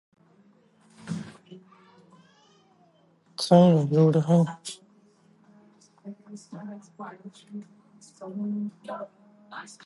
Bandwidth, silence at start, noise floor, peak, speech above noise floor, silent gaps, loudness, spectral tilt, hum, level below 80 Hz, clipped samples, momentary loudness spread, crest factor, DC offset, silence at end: 11.5 kHz; 1.05 s; -62 dBFS; -6 dBFS; 37 dB; none; -23 LUFS; -7.5 dB/octave; none; -74 dBFS; under 0.1%; 26 LU; 24 dB; under 0.1%; 0.15 s